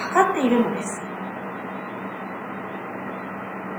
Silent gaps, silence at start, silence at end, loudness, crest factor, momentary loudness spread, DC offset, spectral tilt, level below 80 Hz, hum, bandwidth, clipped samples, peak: none; 0 s; 0 s; -26 LUFS; 22 dB; 13 LU; under 0.1%; -5 dB/octave; -74 dBFS; none; over 20 kHz; under 0.1%; -4 dBFS